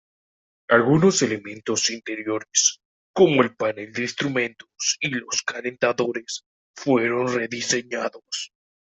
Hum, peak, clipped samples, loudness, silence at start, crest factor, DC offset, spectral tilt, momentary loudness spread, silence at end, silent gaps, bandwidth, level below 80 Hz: none; -2 dBFS; under 0.1%; -22 LUFS; 0.7 s; 20 dB; under 0.1%; -3.5 dB/octave; 13 LU; 0.4 s; 2.85-3.14 s, 6.46-6.74 s; 8.4 kHz; -64 dBFS